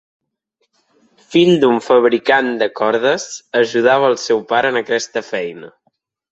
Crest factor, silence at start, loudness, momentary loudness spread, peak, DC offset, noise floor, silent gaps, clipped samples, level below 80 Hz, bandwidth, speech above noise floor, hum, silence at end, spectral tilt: 16 dB; 1.3 s; -15 LUFS; 9 LU; 0 dBFS; under 0.1%; -69 dBFS; none; under 0.1%; -62 dBFS; 8 kHz; 54 dB; none; 0.6 s; -4.5 dB/octave